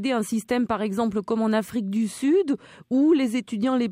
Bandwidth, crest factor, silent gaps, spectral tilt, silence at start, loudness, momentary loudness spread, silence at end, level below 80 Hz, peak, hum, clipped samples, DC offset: 16 kHz; 12 dB; none; -5.5 dB/octave; 0 s; -24 LUFS; 7 LU; 0 s; -60 dBFS; -12 dBFS; none; under 0.1%; under 0.1%